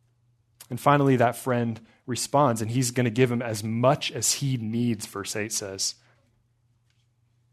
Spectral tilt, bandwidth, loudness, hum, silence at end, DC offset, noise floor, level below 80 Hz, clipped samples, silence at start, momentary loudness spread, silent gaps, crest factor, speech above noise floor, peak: -4.5 dB/octave; 14 kHz; -25 LUFS; none; 1.6 s; under 0.1%; -67 dBFS; -66 dBFS; under 0.1%; 0.6 s; 10 LU; none; 22 dB; 43 dB; -4 dBFS